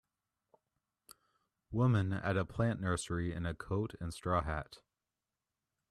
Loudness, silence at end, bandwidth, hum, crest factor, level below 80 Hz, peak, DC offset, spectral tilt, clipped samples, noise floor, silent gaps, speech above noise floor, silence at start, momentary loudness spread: -36 LUFS; 1.15 s; 12.5 kHz; none; 20 dB; -56 dBFS; -18 dBFS; under 0.1%; -6.5 dB/octave; under 0.1%; under -90 dBFS; none; over 55 dB; 1.7 s; 10 LU